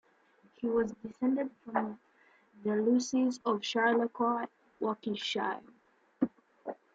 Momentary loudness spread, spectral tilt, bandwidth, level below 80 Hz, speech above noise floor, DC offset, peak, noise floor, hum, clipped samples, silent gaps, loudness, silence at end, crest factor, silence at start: 13 LU; -4.5 dB/octave; 7.8 kHz; -72 dBFS; 35 dB; under 0.1%; -16 dBFS; -66 dBFS; none; under 0.1%; none; -33 LUFS; 0.2 s; 18 dB; 0.6 s